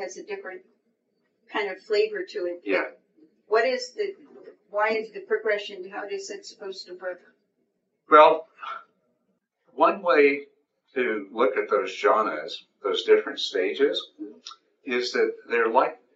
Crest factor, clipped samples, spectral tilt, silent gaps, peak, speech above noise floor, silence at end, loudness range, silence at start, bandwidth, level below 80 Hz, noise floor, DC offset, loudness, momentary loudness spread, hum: 24 dB; under 0.1%; 0 dB/octave; none; -2 dBFS; 50 dB; 0.2 s; 8 LU; 0 s; 8 kHz; -88 dBFS; -74 dBFS; under 0.1%; -24 LUFS; 18 LU; none